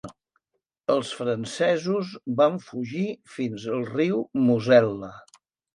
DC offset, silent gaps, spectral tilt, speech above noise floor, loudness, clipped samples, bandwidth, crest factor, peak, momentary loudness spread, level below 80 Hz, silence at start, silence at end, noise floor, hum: under 0.1%; none; -6.5 dB/octave; 56 dB; -25 LUFS; under 0.1%; 11 kHz; 20 dB; -6 dBFS; 13 LU; -68 dBFS; 0.05 s; 0.55 s; -80 dBFS; none